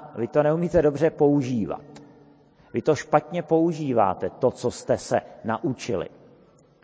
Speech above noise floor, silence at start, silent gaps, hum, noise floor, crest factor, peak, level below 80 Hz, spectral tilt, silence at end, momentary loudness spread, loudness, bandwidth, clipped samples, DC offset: 32 dB; 0 s; none; none; -55 dBFS; 22 dB; -4 dBFS; -52 dBFS; -7 dB/octave; 0.75 s; 9 LU; -24 LUFS; 8 kHz; under 0.1%; under 0.1%